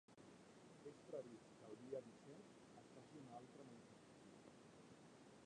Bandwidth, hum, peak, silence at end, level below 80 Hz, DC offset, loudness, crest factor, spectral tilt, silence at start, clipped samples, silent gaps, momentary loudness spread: 10 kHz; none; -40 dBFS; 0 s; -90 dBFS; under 0.1%; -61 LUFS; 22 dB; -5.5 dB/octave; 0.1 s; under 0.1%; none; 11 LU